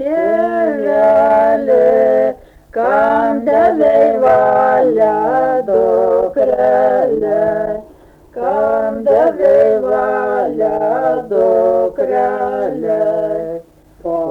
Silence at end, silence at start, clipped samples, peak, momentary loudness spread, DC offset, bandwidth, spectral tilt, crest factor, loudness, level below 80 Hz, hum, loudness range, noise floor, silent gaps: 0 s; 0 s; under 0.1%; -2 dBFS; 8 LU; under 0.1%; 5.8 kHz; -7.5 dB/octave; 10 dB; -13 LUFS; -48 dBFS; none; 3 LU; -42 dBFS; none